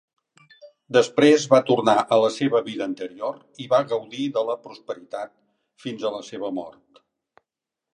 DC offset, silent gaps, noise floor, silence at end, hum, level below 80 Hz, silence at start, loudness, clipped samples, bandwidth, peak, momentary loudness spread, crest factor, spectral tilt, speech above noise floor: under 0.1%; none; -87 dBFS; 1.2 s; none; -74 dBFS; 0.65 s; -22 LUFS; under 0.1%; 10.5 kHz; -2 dBFS; 18 LU; 22 dB; -5 dB/octave; 65 dB